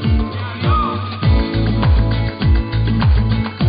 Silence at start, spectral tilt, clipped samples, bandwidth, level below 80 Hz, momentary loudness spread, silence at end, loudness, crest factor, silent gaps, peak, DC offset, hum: 0 s; -12.5 dB/octave; under 0.1%; 5.2 kHz; -18 dBFS; 4 LU; 0 s; -17 LUFS; 10 dB; none; -4 dBFS; under 0.1%; none